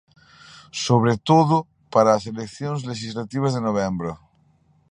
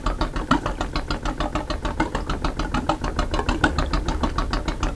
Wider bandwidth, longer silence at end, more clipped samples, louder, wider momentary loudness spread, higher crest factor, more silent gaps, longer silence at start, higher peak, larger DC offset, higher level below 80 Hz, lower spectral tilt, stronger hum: about the same, 10.5 kHz vs 11 kHz; first, 0.75 s vs 0 s; neither; first, -22 LUFS vs -25 LUFS; first, 13 LU vs 5 LU; about the same, 20 dB vs 22 dB; neither; first, 0.55 s vs 0 s; about the same, -2 dBFS vs -2 dBFS; second, under 0.1% vs 0.4%; second, -56 dBFS vs -28 dBFS; about the same, -6 dB/octave vs -5.5 dB/octave; neither